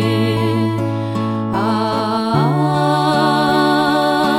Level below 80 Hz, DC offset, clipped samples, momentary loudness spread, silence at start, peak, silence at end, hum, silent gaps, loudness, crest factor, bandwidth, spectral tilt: -52 dBFS; under 0.1%; under 0.1%; 6 LU; 0 s; -2 dBFS; 0 s; none; none; -16 LUFS; 14 dB; 16 kHz; -6.5 dB/octave